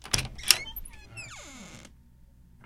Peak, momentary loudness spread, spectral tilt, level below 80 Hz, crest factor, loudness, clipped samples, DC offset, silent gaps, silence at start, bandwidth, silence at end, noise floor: 0 dBFS; 23 LU; -0.5 dB/octave; -48 dBFS; 34 dB; -25 LUFS; under 0.1%; under 0.1%; none; 0 s; 16.5 kHz; 0 s; -55 dBFS